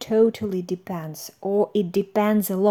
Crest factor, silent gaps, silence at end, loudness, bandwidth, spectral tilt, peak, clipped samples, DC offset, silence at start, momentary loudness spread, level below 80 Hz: 14 dB; none; 0 s; -23 LUFS; over 20 kHz; -6.5 dB/octave; -8 dBFS; under 0.1%; under 0.1%; 0 s; 12 LU; -64 dBFS